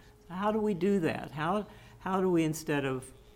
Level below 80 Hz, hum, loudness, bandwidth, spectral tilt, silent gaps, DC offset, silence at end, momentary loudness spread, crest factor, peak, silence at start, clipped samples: -58 dBFS; none; -31 LUFS; 16.5 kHz; -6 dB/octave; none; under 0.1%; 0.25 s; 11 LU; 14 dB; -18 dBFS; 0.3 s; under 0.1%